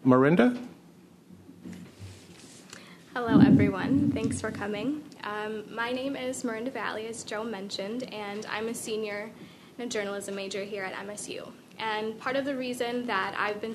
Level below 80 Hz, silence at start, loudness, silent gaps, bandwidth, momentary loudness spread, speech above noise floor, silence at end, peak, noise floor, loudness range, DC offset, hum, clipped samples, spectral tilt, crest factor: -66 dBFS; 0 s; -29 LUFS; none; 13.5 kHz; 24 LU; 26 dB; 0 s; -6 dBFS; -54 dBFS; 8 LU; under 0.1%; none; under 0.1%; -5.5 dB/octave; 24 dB